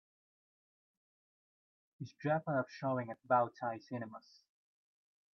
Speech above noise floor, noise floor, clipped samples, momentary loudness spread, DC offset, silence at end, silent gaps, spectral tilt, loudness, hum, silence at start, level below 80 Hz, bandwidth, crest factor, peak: over 53 dB; under -90 dBFS; under 0.1%; 18 LU; under 0.1%; 1.15 s; none; -6.5 dB/octave; -37 LUFS; none; 2 s; -86 dBFS; 6.6 kHz; 22 dB; -18 dBFS